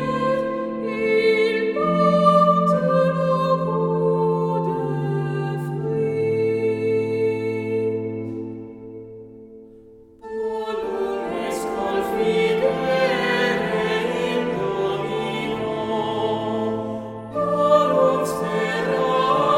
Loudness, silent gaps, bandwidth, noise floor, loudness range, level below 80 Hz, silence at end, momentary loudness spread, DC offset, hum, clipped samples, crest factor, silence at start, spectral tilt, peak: -21 LUFS; none; 15.5 kHz; -47 dBFS; 10 LU; -54 dBFS; 0 s; 10 LU; under 0.1%; none; under 0.1%; 18 dB; 0 s; -6.5 dB/octave; -2 dBFS